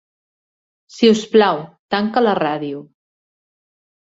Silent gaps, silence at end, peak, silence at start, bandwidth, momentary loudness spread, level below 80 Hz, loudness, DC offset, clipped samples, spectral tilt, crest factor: 1.79-1.89 s; 1.3 s; -2 dBFS; 0.95 s; 8 kHz; 12 LU; -64 dBFS; -17 LUFS; under 0.1%; under 0.1%; -5 dB/octave; 18 dB